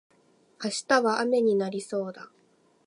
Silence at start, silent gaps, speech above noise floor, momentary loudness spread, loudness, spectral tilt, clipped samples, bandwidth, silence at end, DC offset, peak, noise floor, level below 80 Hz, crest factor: 0.6 s; none; 33 dB; 13 LU; -26 LUFS; -4 dB/octave; under 0.1%; 11.5 kHz; 0.6 s; under 0.1%; -8 dBFS; -59 dBFS; -78 dBFS; 20 dB